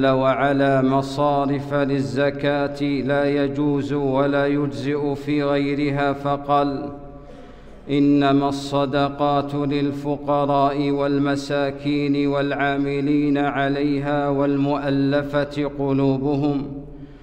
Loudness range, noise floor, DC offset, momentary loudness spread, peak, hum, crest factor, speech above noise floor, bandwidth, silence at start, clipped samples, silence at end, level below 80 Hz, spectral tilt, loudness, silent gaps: 1 LU; -40 dBFS; under 0.1%; 5 LU; -6 dBFS; none; 14 dB; 20 dB; 9 kHz; 0 s; under 0.1%; 0.05 s; -46 dBFS; -7.5 dB/octave; -21 LUFS; none